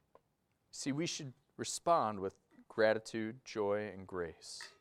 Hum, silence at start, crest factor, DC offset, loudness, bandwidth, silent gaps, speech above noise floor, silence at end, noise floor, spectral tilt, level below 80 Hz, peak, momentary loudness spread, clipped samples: none; 0.75 s; 20 dB; under 0.1%; -37 LUFS; 14.5 kHz; none; 43 dB; 0.1 s; -80 dBFS; -4 dB/octave; -76 dBFS; -18 dBFS; 13 LU; under 0.1%